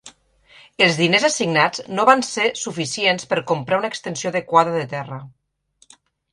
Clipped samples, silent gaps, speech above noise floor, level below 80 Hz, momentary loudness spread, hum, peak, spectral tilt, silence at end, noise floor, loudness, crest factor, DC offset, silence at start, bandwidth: under 0.1%; none; 40 dB; -64 dBFS; 10 LU; none; 0 dBFS; -3.5 dB/octave; 1.05 s; -60 dBFS; -19 LUFS; 20 dB; under 0.1%; 0.05 s; 11.5 kHz